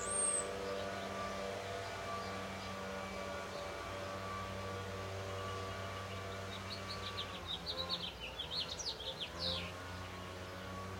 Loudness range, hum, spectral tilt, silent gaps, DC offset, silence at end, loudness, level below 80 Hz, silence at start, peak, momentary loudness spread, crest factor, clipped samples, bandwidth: 3 LU; none; -2.5 dB/octave; none; under 0.1%; 0 s; -42 LUFS; -60 dBFS; 0 s; -24 dBFS; 6 LU; 18 dB; under 0.1%; 16.5 kHz